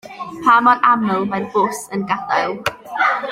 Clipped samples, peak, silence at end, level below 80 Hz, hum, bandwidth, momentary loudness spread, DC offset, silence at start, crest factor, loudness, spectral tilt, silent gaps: under 0.1%; -2 dBFS; 0 s; -58 dBFS; none; 16 kHz; 12 LU; under 0.1%; 0.05 s; 16 dB; -17 LUFS; -4.5 dB/octave; none